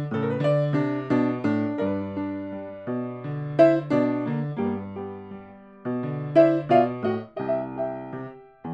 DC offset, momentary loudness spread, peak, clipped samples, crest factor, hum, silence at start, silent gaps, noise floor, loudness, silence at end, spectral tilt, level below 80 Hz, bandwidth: under 0.1%; 17 LU; -6 dBFS; under 0.1%; 20 dB; none; 0 s; none; -44 dBFS; -25 LUFS; 0 s; -9.5 dB/octave; -64 dBFS; 8 kHz